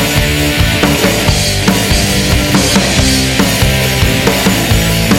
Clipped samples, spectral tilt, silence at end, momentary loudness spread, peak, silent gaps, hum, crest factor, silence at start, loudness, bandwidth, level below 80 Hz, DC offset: under 0.1%; -4 dB/octave; 0 s; 2 LU; 0 dBFS; none; none; 10 dB; 0 s; -10 LUFS; 16.5 kHz; -20 dBFS; under 0.1%